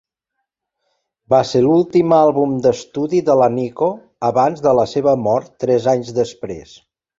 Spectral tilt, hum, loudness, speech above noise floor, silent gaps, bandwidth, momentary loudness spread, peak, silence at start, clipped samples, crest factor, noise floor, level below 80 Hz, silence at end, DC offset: -7 dB/octave; none; -16 LUFS; 62 dB; none; 7.8 kHz; 8 LU; 0 dBFS; 1.3 s; under 0.1%; 16 dB; -77 dBFS; -54 dBFS; 0.6 s; under 0.1%